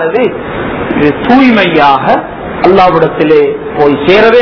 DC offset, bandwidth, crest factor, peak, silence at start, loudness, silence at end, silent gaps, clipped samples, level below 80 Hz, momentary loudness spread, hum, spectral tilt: under 0.1%; 5.4 kHz; 8 dB; 0 dBFS; 0 s; -8 LUFS; 0 s; none; 6%; -34 dBFS; 8 LU; none; -7.5 dB/octave